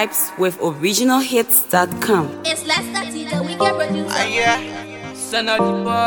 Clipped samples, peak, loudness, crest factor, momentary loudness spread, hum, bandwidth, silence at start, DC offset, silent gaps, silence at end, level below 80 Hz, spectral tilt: under 0.1%; 0 dBFS; -18 LUFS; 18 dB; 10 LU; none; 19 kHz; 0 s; under 0.1%; none; 0 s; -56 dBFS; -3 dB/octave